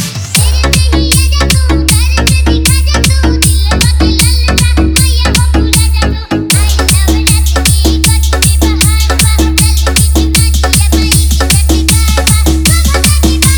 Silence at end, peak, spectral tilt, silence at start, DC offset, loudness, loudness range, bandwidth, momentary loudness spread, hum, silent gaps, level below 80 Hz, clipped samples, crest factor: 0 s; 0 dBFS; -4 dB/octave; 0 s; under 0.1%; -8 LUFS; 1 LU; over 20 kHz; 1 LU; none; none; -10 dBFS; 0.6%; 8 dB